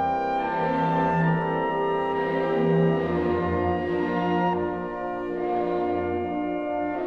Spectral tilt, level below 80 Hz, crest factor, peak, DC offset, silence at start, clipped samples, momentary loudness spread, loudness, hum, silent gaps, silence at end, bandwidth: -9 dB/octave; -50 dBFS; 14 dB; -10 dBFS; 0.1%; 0 s; under 0.1%; 6 LU; -25 LUFS; none; none; 0 s; 6.6 kHz